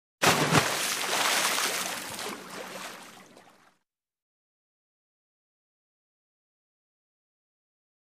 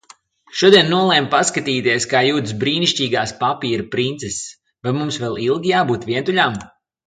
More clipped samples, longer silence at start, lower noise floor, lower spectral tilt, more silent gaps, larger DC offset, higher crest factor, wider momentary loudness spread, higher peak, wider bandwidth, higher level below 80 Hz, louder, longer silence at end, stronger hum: neither; second, 0.2 s vs 0.5 s; first, -77 dBFS vs -49 dBFS; second, -2 dB/octave vs -4 dB/octave; neither; neither; first, 28 dB vs 18 dB; first, 16 LU vs 13 LU; second, -4 dBFS vs 0 dBFS; first, 15.5 kHz vs 9.6 kHz; second, -66 dBFS vs -54 dBFS; second, -26 LUFS vs -17 LUFS; first, 4.7 s vs 0.4 s; neither